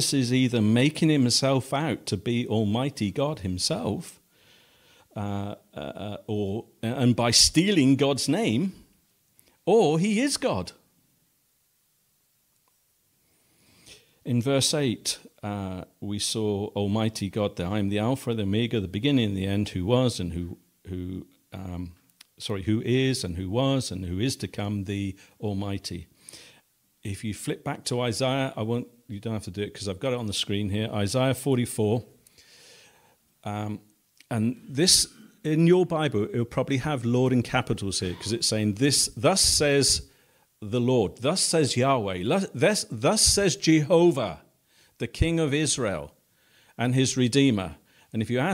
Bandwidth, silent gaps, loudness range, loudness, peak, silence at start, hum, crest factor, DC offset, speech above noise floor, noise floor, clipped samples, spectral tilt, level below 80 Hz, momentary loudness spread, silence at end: 16 kHz; none; 8 LU; -25 LUFS; -4 dBFS; 0 s; none; 22 dB; under 0.1%; 44 dB; -69 dBFS; under 0.1%; -4.5 dB/octave; -50 dBFS; 16 LU; 0 s